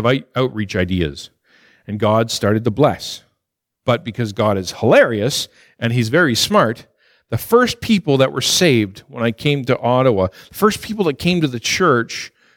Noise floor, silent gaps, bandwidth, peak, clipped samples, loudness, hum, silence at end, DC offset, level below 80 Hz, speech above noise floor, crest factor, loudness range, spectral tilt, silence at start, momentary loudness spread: -78 dBFS; none; 19 kHz; -2 dBFS; under 0.1%; -17 LUFS; none; 0.3 s; under 0.1%; -48 dBFS; 61 dB; 16 dB; 4 LU; -5 dB/octave; 0 s; 12 LU